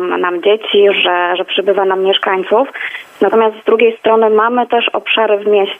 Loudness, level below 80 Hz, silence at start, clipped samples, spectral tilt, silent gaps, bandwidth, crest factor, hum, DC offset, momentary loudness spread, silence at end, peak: -12 LUFS; -68 dBFS; 0 s; under 0.1%; -5.5 dB/octave; none; 3.8 kHz; 12 dB; none; under 0.1%; 4 LU; 0 s; 0 dBFS